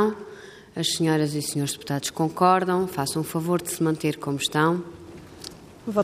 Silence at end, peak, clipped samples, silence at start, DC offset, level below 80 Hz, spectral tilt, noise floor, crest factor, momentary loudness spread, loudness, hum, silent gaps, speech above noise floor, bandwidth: 0 s; -6 dBFS; under 0.1%; 0 s; under 0.1%; -62 dBFS; -4.5 dB/octave; -44 dBFS; 20 dB; 19 LU; -24 LUFS; none; none; 20 dB; 15.5 kHz